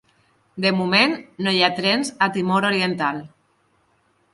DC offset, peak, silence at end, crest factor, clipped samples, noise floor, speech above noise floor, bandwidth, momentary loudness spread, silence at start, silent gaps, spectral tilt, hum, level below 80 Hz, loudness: under 0.1%; -2 dBFS; 1.05 s; 20 dB; under 0.1%; -63 dBFS; 43 dB; 11.5 kHz; 8 LU; 0.55 s; none; -4.5 dB/octave; none; -66 dBFS; -20 LUFS